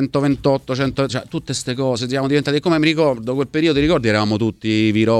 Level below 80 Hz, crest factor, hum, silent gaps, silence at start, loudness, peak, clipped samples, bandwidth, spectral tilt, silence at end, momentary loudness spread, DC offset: -42 dBFS; 16 dB; none; none; 0 s; -18 LUFS; -2 dBFS; under 0.1%; 12.5 kHz; -6 dB/octave; 0 s; 6 LU; under 0.1%